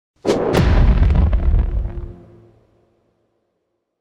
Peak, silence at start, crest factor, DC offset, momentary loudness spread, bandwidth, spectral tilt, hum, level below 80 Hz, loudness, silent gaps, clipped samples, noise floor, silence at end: -4 dBFS; 0.25 s; 14 dB; under 0.1%; 14 LU; 10.5 kHz; -7.5 dB/octave; none; -20 dBFS; -18 LUFS; none; under 0.1%; -72 dBFS; 1.85 s